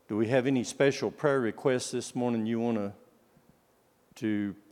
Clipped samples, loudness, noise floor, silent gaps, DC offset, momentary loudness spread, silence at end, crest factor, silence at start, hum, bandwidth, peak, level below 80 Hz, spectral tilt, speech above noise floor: under 0.1%; -30 LUFS; -67 dBFS; none; under 0.1%; 7 LU; 0.2 s; 20 dB; 0.1 s; none; 15.5 kHz; -10 dBFS; -78 dBFS; -5.5 dB/octave; 38 dB